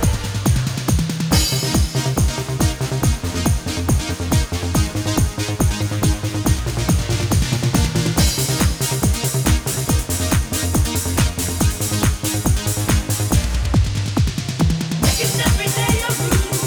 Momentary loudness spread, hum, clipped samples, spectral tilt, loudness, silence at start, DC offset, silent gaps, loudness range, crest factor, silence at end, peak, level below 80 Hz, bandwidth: 3 LU; none; under 0.1%; -4.5 dB/octave; -19 LUFS; 0 s; under 0.1%; none; 2 LU; 16 dB; 0 s; -2 dBFS; -24 dBFS; over 20 kHz